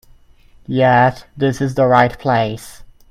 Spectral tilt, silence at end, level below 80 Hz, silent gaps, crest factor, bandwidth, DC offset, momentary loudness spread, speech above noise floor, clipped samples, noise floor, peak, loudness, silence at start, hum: -6.5 dB/octave; 0.25 s; -44 dBFS; none; 16 dB; 15 kHz; under 0.1%; 11 LU; 32 dB; under 0.1%; -47 dBFS; 0 dBFS; -15 LUFS; 0.7 s; none